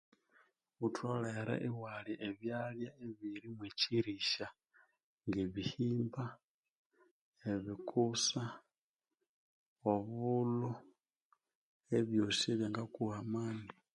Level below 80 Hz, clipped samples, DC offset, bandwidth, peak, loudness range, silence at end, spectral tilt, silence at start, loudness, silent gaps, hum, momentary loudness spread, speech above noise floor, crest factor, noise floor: -72 dBFS; under 0.1%; under 0.1%; 11 kHz; -18 dBFS; 4 LU; 0.25 s; -5 dB/octave; 0.8 s; -39 LUFS; 5.03-5.18 s, 6.44-6.63 s, 6.70-6.90 s, 7.11-7.32 s, 8.78-8.94 s, 9.29-9.76 s, 11.22-11.30 s, 11.55-11.80 s; none; 12 LU; over 52 dB; 22 dB; under -90 dBFS